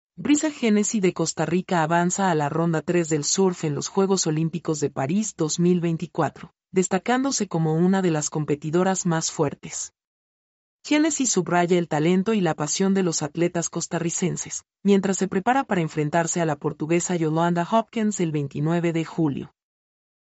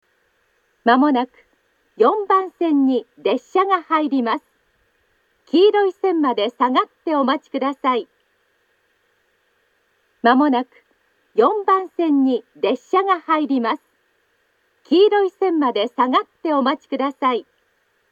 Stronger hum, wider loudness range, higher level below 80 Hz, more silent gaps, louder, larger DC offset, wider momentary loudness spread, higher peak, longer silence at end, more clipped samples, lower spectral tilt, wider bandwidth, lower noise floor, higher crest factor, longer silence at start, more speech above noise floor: neither; about the same, 2 LU vs 4 LU; first, -64 dBFS vs -80 dBFS; first, 10.07-10.79 s vs none; second, -23 LUFS vs -19 LUFS; neither; about the same, 6 LU vs 7 LU; second, -8 dBFS vs 0 dBFS; first, 0.9 s vs 0.7 s; neither; about the same, -5 dB/octave vs -5.5 dB/octave; first, 8.2 kHz vs 7.4 kHz; first, under -90 dBFS vs -65 dBFS; about the same, 16 dB vs 20 dB; second, 0.2 s vs 0.85 s; first, over 67 dB vs 47 dB